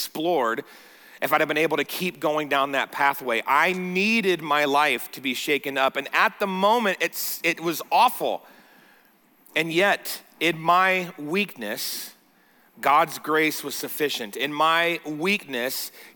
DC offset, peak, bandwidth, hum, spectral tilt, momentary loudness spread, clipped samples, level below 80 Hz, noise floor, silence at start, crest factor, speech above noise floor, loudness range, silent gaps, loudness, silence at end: under 0.1%; -8 dBFS; 19.5 kHz; none; -3.5 dB/octave; 8 LU; under 0.1%; -80 dBFS; -59 dBFS; 0 s; 16 dB; 35 dB; 3 LU; none; -23 LUFS; 0.05 s